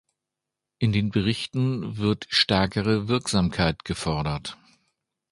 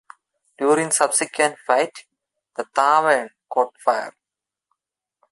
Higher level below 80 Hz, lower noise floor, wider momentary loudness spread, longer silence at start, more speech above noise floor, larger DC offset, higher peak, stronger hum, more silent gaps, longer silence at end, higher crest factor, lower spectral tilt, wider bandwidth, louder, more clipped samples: first, -44 dBFS vs -76 dBFS; about the same, -86 dBFS vs -87 dBFS; second, 7 LU vs 10 LU; first, 0.8 s vs 0.6 s; second, 62 dB vs 68 dB; neither; about the same, -4 dBFS vs -2 dBFS; neither; neither; second, 0.8 s vs 1.2 s; about the same, 20 dB vs 20 dB; first, -5.5 dB/octave vs -2 dB/octave; about the same, 11.5 kHz vs 12 kHz; second, -24 LUFS vs -20 LUFS; neither